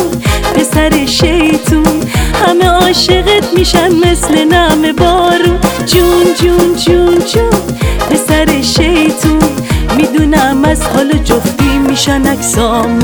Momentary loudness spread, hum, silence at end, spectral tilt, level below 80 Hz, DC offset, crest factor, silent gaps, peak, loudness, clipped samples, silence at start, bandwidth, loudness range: 4 LU; none; 0 s; -4.5 dB/octave; -20 dBFS; under 0.1%; 8 dB; none; 0 dBFS; -9 LUFS; 0.2%; 0 s; over 20 kHz; 2 LU